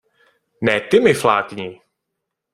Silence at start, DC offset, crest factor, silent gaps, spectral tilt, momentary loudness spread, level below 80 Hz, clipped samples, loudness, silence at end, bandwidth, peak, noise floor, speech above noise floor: 0.6 s; under 0.1%; 20 dB; none; -5 dB/octave; 16 LU; -58 dBFS; under 0.1%; -17 LUFS; 0.8 s; 15.5 kHz; 0 dBFS; -79 dBFS; 62 dB